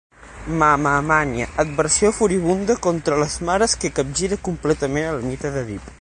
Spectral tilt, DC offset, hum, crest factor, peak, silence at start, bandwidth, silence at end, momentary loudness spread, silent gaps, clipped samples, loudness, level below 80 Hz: -4 dB/octave; under 0.1%; none; 18 dB; -2 dBFS; 0.2 s; 10.5 kHz; 0.05 s; 9 LU; none; under 0.1%; -20 LUFS; -40 dBFS